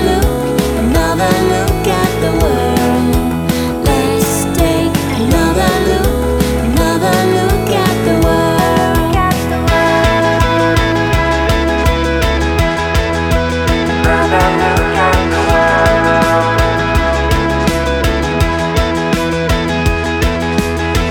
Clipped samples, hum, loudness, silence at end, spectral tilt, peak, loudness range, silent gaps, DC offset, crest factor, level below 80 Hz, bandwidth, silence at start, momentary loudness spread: under 0.1%; none; -13 LUFS; 0 s; -5.5 dB/octave; 0 dBFS; 2 LU; none; under 0.1%; 12 dB; -20 dBFS; 19 kHz; 0 s; 4 LU